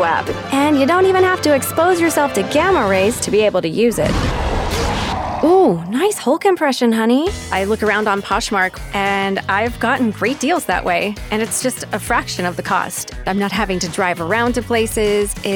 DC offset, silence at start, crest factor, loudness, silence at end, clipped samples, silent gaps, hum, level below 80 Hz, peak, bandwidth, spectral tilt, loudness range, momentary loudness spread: under 0.1%; 0 s; 14 dB; -16 LUFS; 0 s; under 0.1%; none; none; -32 dBFS; -4 dBFS; 19.5 kHz; -4.5 dB/octave; 4 LU; 6 LU